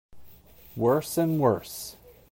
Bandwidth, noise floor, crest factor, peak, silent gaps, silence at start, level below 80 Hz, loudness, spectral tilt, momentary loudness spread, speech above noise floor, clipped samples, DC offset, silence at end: 16.5 kHz; -50 dBFS; 18 dB; -10 dBFS; none; 0.15 s; -60 dBFS; -26 LUFS; -6 dB/octave; 16 LU; 25 dB; under 0.1%; under 0.1%; 0.4 s